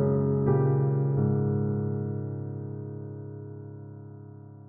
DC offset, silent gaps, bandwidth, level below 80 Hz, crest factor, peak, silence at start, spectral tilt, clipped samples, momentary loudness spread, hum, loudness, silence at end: under 0.1%; none; 2.1 kHz; -64 dBFS; 16 dB; -12 dBFS; 0 s; -14.5 dB/octave; under 0.1%; 20 LU; none; -28 LUFS; 0 s